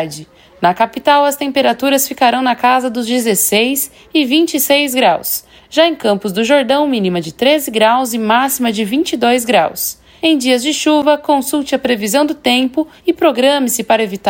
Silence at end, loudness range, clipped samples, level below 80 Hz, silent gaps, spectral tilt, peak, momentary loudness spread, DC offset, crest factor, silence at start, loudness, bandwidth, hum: 0 s; 1 LU; under 0.1%; -54 dBFS; none; -3 dB/octave; 0 dBFS; 5 LU; under 0.1%; 14 dB; 0 s; -13 LUFS; 16.5 kHz; none